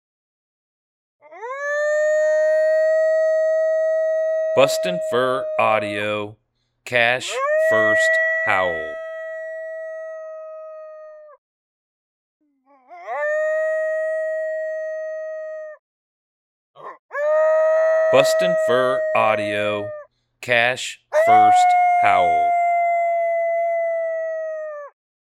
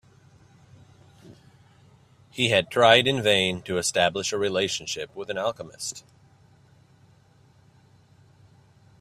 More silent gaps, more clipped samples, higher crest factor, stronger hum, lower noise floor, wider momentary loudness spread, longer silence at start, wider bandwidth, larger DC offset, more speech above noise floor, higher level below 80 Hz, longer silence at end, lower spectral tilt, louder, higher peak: first, 11.38-12.40 s, 15.79-16.74 s, 16.99-17.09 s vs none; neither; second, 20 dB vs 26 dB; neither; about the same, -56 dBFS vs -57 dBFS; about the same, 17 LU vs 16 LU; about the same, 1.3 s vs 1.25 s; about the same, 14 kHz vs 15 kHz; neither; first, 38 dB vs 34 dB; about the same, -66 dBFS vs -62 dBFS; second, 0.4 s vs 3 s; about the same, -3.5 dB/octave vs -3 dB/octave; first, -19 LUFS vs -23 LUFS; about the same, 0 dBFS vs -2 dBFS